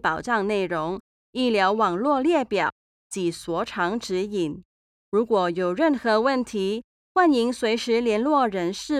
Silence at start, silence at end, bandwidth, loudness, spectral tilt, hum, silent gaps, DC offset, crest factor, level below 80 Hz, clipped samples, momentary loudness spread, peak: 0.05 s; 0 s; 14 kHz; -23 LUFS; -5 dB/octave; none; 1.00-1.33 s, 2.72-3.10 s, 4.65-5.12 s, 6.84-7.15 s; under 0.1%; 16 dB; -58 dBFS; under 0.1%; 8 LU; -8 dBFS